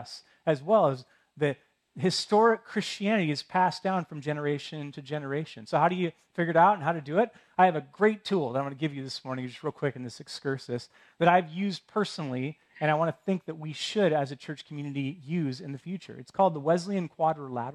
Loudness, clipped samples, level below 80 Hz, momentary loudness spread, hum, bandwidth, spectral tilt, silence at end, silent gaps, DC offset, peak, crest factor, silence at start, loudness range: -28 LUFS; under 0.1%; -76 dBFS; 14 LU; none; 12 kHz; -6 dB/octave; 0 s; none; under 0.1%; -8 dBFS; 22 dB; 0 s; 4 LU